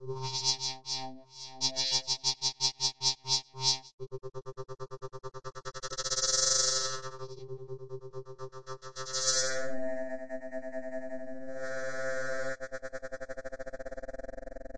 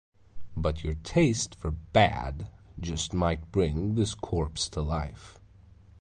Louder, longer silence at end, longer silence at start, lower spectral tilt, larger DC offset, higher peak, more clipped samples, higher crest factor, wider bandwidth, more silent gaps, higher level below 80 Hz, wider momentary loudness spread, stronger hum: second, -32 LUFS vs -29 LUFS; second, 0 s vs 0.65 s; second, 0 s vs 0.35 s; second, -1 dB/octave vs -5 dB/octave; first, 0.5% vs under 0.1%; about the same, -12 dBFS vs -10 dBFS; neither; about the same, 22 dB vs 20 dB; first, 11.5 kHz vs 10 kHz; first, 3.94-3.98 s vs none; second, -56 dBFS vs -40 dBFS; about the same, 17 LU vs 15 LU; neither